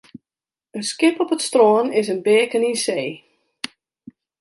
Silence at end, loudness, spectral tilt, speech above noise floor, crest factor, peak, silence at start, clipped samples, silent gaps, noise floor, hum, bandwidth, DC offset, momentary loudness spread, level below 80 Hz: 1.25 s; -19 LUFS; -3.5 dB/octave; over 72 dB; 16 dB; -4 dBFS; 0.75 s; under 0.1%; none; under -90 dBFS; none; 11.5 kHz; under 0.1%; 17 LU; -74 dBFS